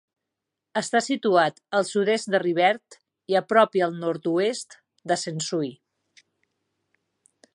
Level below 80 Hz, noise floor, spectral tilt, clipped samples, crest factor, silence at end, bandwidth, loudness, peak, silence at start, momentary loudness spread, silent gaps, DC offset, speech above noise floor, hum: -80 dBFS; -84 dBFS; -4 dB/octave; under 0.1%; 22 dB; 1.8 s; 11.5 kHz; -24 LUFS; -4 dBFS; 0.75 s; 11 LU; none; under 0.1%; 61 dB; none